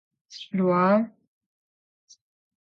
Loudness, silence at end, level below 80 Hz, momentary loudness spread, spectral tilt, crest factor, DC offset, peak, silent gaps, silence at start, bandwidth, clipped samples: -24 LUFS; 1.7 s; -76 dBFS; 21 LU; -7.5 dB/octave; 18 dB; under 0.1%; -10 dBFS; none; 0.3 s; 7 kHz; under 0.1%